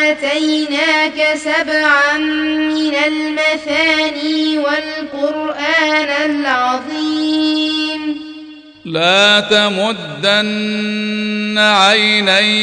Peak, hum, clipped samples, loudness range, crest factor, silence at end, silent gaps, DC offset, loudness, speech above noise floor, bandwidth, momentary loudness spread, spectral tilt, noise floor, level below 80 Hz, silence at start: 0 dBFS; none; under 0.1%; 3 LU; 14 dB; 0 s; none; under 0.1%; -13 LUFS; 20 dB; 10 kHz; 9 LU; -3 dB/octave; -35 dBFS; -58 dBFS; 0 s